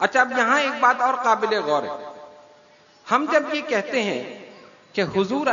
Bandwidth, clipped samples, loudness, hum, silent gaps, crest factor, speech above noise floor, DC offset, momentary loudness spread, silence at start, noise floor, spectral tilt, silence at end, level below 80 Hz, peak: 7.4 kHz; under 0.1%; -21 LUFS; none; none; 20 dB; 32 dB; under 0.1%; 14 LU; 0 s; -53 dBFS; -4 dB/octave; 0 s; -68 dBFS; -4 dBFS